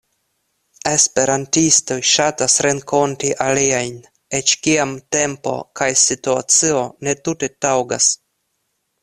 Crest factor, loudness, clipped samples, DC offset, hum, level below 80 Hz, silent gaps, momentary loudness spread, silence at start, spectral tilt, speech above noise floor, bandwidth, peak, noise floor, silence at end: 18 dB; -16 LUFS; under 0.1%; under 0.1%; none; -56 dBFS; none; 9 LU; 0.85 s; -2 dB/octave; 53 dB; 14 kHz; 0 dBFS; -71 dBFS; 0.9 s